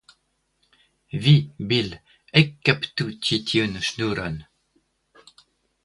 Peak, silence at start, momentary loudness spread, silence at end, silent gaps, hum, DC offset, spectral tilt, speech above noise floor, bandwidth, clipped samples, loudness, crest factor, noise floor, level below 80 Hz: 0 dBFS; 1.15 s; 14 LU; 1.4 s; none; none; under 0.1%; -5.5 dB/octave; 48 dB; 11.5 kHz; under 0.1%; -22 LUFS; 24 dB; -70 dBFS; -54 dBFS